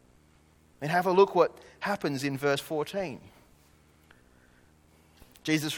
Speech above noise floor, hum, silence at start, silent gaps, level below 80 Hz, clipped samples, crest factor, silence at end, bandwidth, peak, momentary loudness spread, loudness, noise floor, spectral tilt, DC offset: 34 dB; none; 0.8 s; none; -66 dBFS; under 0.1%; 22 dB; 0 s; 18.5 kHz; -8 dBFS; 15 LU; -28 LUFS; -61 dBFS; -5 dB/octave; under 0.1%